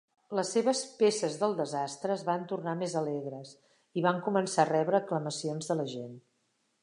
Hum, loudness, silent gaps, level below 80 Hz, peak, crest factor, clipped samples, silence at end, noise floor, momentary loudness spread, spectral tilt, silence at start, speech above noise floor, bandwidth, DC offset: none; -31 LUFS; none; -84 dBFS; -10 dBFS; 22 dB; under 0.1%; 0.65 s; -76 dBFS; 11 LU; -5 dB/octave; 0.3 s; 45 dB; 11 kHz; under 0.1%